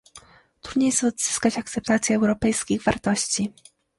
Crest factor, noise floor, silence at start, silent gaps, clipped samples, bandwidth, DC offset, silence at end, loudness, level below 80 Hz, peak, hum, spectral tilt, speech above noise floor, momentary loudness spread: 18 dB; -50 dBFS; 0.15 s; none; under 0.1%; 11.5 kHz; under 0.1%; 0.5 s; -23 LUFS; -50 dBFS; -6 dBFS; none; -3.5 dB/octave; 28 dB; 8 LU